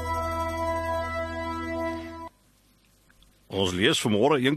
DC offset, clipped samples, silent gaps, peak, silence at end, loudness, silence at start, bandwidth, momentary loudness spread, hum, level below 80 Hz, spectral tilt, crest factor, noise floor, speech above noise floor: under 0.1%; under 0.1%; none; -8 dBFS; 0 s; -27 LUFS; 0 s; 13 kHz; 14 LU; none; -46 dBFS; -4.5 dB/octave; 20 dB; -62 dBFS; 39 dB